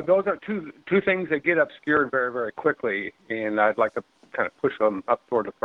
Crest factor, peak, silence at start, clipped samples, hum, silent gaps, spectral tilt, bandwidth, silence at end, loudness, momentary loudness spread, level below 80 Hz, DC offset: 18 dB; -6 dBFS; 0 s; under 0.1%; none; none; -8 dB/octave; 6 kHz; 0.15 s; -25 LUFS; 8 LU; -66 dBFS; under 0.1%